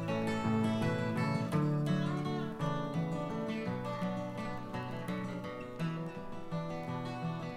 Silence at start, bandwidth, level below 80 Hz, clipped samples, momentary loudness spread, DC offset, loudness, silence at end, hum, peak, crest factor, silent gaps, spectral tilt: 0 s; 13.5 kHz; -58 dBFS; under 0.1%; 8 LU; under 0.1%; -36 LUFS; 0 s; none; -20 dBFS; 16 dB; none; -7.5 dB/octave